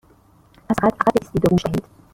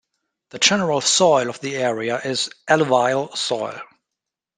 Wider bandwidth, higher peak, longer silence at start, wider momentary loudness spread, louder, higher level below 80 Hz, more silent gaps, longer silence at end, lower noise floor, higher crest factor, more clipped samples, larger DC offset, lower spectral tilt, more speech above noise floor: first, 16.5 kHz vs 10 kHz; about the same, 0 dBFS vs -2 dBFS; first, 0.7 s vs 0.55 s; about the same, 8 LU vs 10 LU; about the same, -20 LUFS vs -19 LUFS; first, -44 dBFS vs -66 dBFS; neither; second, 0.3 s vs 0.75 s; second, -53 dBFS vs -84 dBFS; about the same, 20 dB vs 20 dB; neither; neither; first, -7 dB/octave vs -2.5 dB/octave; second, 35 dB vs 65 dB